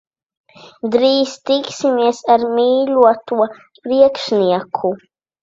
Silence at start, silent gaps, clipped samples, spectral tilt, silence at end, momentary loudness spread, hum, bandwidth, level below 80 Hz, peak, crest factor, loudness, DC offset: 0.65 s; none; under 0.1%; -5 dB/octave; 0.45 s; 8 LU; none; 7.8 kHz; -62 dBFS; 0 dBFS; 16 dB; -15 LUFS; under 0.1%